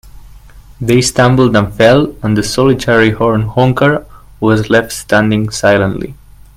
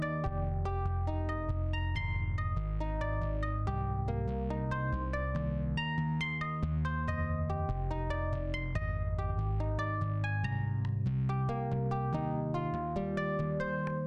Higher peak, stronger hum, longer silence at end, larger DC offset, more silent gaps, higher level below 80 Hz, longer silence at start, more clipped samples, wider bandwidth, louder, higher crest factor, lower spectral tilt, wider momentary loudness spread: first, 0 dBFS vs -20 dBFS; neither; first, 0.45 s vs 0 s; neither; neither; about the same, -36 dBFS vs -40 dBFS; about the same, 0.05 s vs 0 s; neither; first, 16 kHz vs 7.4 kHz; first, -11 LUFS vs -34 LUFS; about the same, 12 dB vs 12 dB; second, -5.5 dB/octave vs -8.5 dB/octave; first, 7 LU vs 2 LU